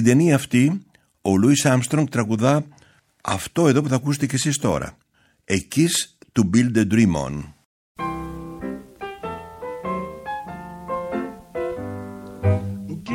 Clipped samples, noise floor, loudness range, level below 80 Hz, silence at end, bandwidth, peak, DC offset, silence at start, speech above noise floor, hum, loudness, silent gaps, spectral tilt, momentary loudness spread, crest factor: under 0.1%; -55 dBFS; 11 LU; -48 dBFS; 0 s; 17 kHz; -2 dBFS; under 0.1%; 0 s; 36 dB; none; -21 LUFS; 7.65-7.95 s; -5.5 dB/octave; 16 LU; 20 dB